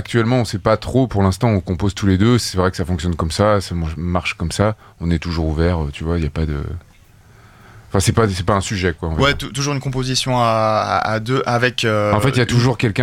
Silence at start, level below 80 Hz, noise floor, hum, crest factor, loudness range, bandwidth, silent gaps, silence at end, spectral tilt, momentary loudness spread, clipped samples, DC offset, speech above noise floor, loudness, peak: 0 s; -32 dBFS; -47 dBFS; none; 16 dB; 4 LU; 15.5 kHz; none; 0 s; -5.5 dB/octave; 6 LU; under 0.1%; under 0.1%; 30 dB; -18 LUFS; -2 dBFS